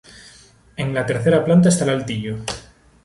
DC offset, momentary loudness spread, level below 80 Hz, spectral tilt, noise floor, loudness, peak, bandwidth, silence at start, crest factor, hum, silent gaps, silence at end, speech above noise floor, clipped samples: under 0.1%; 15 LU; -48 dBFS; -6 dB/octave; -48 dBFS; -19 LUFS; -4 dBFS; 11.5 kHz; 0.2 s; 16 dB; none; none; 0.45 s; 31 dB; under 0.1%